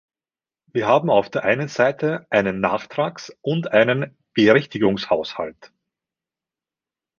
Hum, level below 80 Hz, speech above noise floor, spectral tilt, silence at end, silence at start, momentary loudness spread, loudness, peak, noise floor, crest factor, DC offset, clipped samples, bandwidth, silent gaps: none; -58 dBFS; over 70 dB; -6.5 dB/octave; 1.55 s; 0.75 s; 10 LU; -20 LUFS; -2 dBFS; under -90 dBFS; 20 dB; under 0.1%; under 0.1%; 7.2 kHz; none